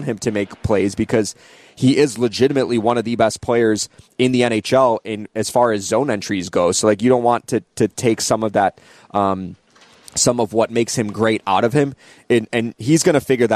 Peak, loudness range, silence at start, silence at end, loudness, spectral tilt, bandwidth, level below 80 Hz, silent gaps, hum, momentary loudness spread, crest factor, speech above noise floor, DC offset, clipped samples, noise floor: -2 dBFS; 2 LU; 0 s; 0 s; -18 LUFS; -4.5 dB/octave; 14 kHz; -50 dBFS; none; none; 7 LU; 16 dB; 29 dB; under 0.1%; under 0.1%; -46 dBFS